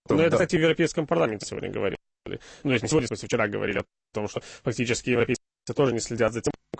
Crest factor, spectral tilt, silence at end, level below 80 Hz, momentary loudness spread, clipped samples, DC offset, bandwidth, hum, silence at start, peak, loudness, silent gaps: 16 dB; -5 dB/octave; 0.05 s; -52 dBFS; 12 LU; under 0.1%; under 0.1%; 8.8 kHz; none; 0.1 s; -10 dBFS; -26 LUFS; none